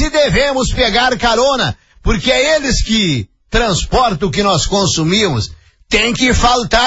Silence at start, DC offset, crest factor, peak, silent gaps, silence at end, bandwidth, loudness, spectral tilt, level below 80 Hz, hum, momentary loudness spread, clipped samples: 0 s; under 0.1%; 14 dB; 0 dBFS; none; 0 s; 8 kHz; -13 LUFS; -3.5 dB/octave; -24 dBFS; none; 7 LU; under 0.1%